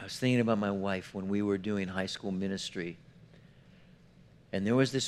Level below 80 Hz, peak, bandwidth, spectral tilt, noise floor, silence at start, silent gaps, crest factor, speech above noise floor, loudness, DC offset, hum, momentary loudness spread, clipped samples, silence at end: -68 dBFS; -14 dBFS; 13 kHz; -5.5 dB/octave; -58 dBFS; 0 s; none; 20 dB; 27 dB; -32 LUFS; under 0.1%; none; 11 LU; under 0.1%; 0 s